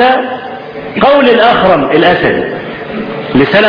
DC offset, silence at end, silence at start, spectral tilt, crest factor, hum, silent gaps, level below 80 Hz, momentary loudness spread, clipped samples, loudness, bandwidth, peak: under 0.1%; 0 s; 0 s; -7.5 dB/octave; 10 dB; none; none; -38 dBFS; 14 LU; 0.2%; -9 LUFS; 5.4 kHz; 0 dBFS